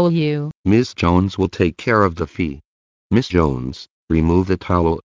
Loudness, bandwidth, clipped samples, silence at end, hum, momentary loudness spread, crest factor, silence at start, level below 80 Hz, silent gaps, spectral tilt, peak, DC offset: -18 LUFS; 7.6 kHz; under 0.1%; 0.05 s; none; 9 LU; 16 dB; 0 s; -34 dBFS; 0.55-0.64 s, 2.65-3.10 s, 3.90-4.08 s; -7.5 dB/octave; -2 dBFS; under 0.1%